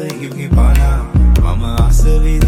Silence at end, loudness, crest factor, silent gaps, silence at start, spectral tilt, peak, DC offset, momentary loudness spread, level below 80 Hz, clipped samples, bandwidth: 0 s; -14 LUFS; 8 dB; none; 0 s; -6.5 dB/octave; -2 dBFS; under 0.1%; 4 LU; -12 dBFS; under 0.1%; 15.5 kHz